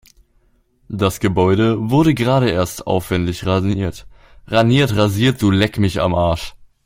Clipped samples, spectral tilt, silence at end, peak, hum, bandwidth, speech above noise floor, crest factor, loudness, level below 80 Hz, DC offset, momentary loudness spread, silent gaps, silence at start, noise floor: under 0.1%; -6.5 dB/octave; 0.3 s; 0 dBFS; none; 16.5 kHz; 42 dB; 16 dB; -17 LUFS; -40 dBFS; under 0.1%; 7 LU; none; 0.9 s; -58 dBFS